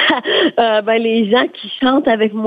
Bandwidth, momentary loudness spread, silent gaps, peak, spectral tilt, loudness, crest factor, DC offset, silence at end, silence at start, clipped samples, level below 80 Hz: 5.2 kHz; 2 LU; none; -2 dBFS; -6.5 dB/octave; -14 LUFS; 12 dB; under 0.1%; 0 s; 0 s; under 0.1%; -58 dBFS